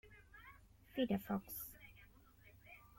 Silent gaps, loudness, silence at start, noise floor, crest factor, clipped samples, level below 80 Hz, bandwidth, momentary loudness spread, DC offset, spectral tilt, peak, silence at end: none; -43 LUFS; 0.05 s; -65 dBFS; 20 dB; under 0.1%; -68 dBFS; 16.5 kHz; 25 LU; under 0.1%; -5.5 dB/octave; -26 dBFS; 0.15 s